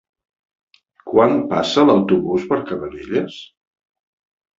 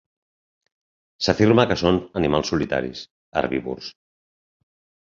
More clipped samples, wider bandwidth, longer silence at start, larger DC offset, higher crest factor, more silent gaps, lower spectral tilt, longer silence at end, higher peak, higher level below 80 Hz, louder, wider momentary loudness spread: neither; about the same, 7.8 kHz vs 7.4 kHz; second, 1.05 s vs 1.2 s; neither; about the same, 18 dB vs 22 dB; second, none vs 3.11-3.32 s; about the same, -6 dB/octave vs -6 dB/octave; about the same, 1.15 s vs 1.15 s; about the same, -2 dBFS vs -2 dBFS; second, -54 dBFS vs -46 dBFS; first, -17 LUFS vs -21 LUFS; second, 13 LU vs 16 LU